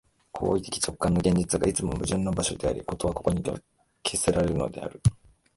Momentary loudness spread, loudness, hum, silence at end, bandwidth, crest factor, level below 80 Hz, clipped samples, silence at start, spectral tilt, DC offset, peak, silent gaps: 8 LU; -27 LUFS; none; 0.45 s; 12 kHz; 20 dB; -42 dBFS; under 0.1%; 0.35 s; -5 dB/octave; under 0.1%; -8 dBFS; none